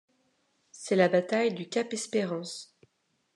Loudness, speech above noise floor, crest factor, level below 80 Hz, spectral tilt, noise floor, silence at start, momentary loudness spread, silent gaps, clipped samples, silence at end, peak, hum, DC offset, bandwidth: -28 LUFS; 47 dB; 20 dB; -88 dBFS; -4.5 dB/octave; -75 dBFS; 0.75 s; 16 LU; none; under 0.1%; 0.7 s; -10 dBFS; none; under 0.1%; 11.5 kHz